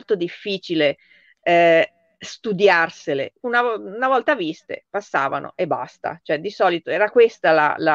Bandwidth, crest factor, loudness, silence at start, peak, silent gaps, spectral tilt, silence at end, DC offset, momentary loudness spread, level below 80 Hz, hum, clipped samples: 7.6 kHz; 16 dB; -20 LUFS; 0.1 s; -2 dBFS; none; -5 dB/octave; 0 s; under 0.1%; 13 LU; -70 dBFS; none; under 0.1%